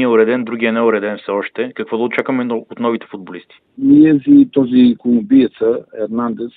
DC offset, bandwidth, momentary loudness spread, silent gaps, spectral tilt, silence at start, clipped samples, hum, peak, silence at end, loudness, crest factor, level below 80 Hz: under 0.1%; 4.1 kHz; 13 LU; none; -9.5 dB/octave; 0 s; under 0.1%; none; 0 dBFS; 0.1 s; -14 LUFS; 14 dB; -56 dBFS